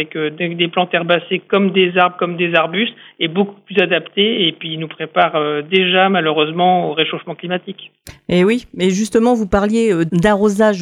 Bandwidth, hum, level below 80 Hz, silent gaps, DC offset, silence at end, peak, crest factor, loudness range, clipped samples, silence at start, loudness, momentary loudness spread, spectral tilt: 13.5 kHz; none; -46 dBFS; none; under 0.1%; 0 s; 0 dBFS; 14 dB; 2 LU; under 0.1%; 0 s; -16 LUFS; 9 LU; -5.5 dB/octave